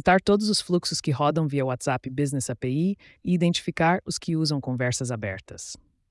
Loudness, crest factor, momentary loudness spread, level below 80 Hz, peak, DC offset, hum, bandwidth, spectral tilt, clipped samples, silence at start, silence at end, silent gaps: -25 LUFS; 16 dB; 11 LU; -54 dBFS; -8 dBFS; under 0.1%; none; 12 kHz; -5 dB/octave; under 0.1%; 0.05 s; 0.35 s; none